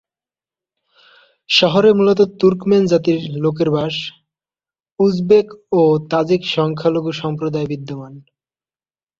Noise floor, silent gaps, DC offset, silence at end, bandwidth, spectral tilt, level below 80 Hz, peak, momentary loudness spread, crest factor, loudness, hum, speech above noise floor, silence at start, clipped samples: under -90 dBFS; none; under 0.1%; 1 s; 7.6 kHz; -6.5 dB/octave; -56 dBFS; 0 dBFS; 10 LU; 16 dB; -16 LUFS; none; over 75 dB; 1.5 s; under 0.1%